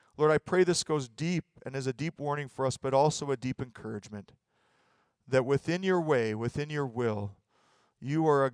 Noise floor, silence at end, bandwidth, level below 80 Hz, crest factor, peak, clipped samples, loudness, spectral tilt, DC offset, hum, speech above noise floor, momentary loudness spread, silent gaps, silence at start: -71 dBFS; 0 s; 10.5 kHz; -64 dBFS; 18 dB; -12 dBFS; under 0.1%; -30 LUFS; -5.5 dB/octave; under 0.1%; none; 41 dB; 14 LU; none; 0.2 s